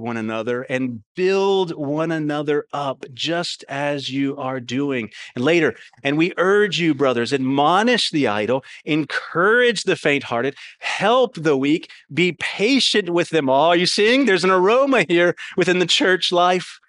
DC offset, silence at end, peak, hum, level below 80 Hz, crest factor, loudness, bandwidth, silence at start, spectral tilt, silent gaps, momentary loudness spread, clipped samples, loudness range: under 0.1%; 0.15 s; -2 dBFS; none; -68 dBFS; 18 dB; -19 LUFS; 11 kHz; 0 s; -4.5 dB/octave; 1.06-1.15 s; 9 LU; under 0.1%; 6 LU